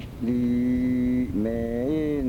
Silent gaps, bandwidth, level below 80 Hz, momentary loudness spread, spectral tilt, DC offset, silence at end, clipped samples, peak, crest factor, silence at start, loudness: none; 6.4 kHz; -40 dBFS; 3 LU; -9 dB/octave; under 0.1%; 0 s; under 0.1%; -16 dBFS; 10 dB; 0 s; -25 LUFS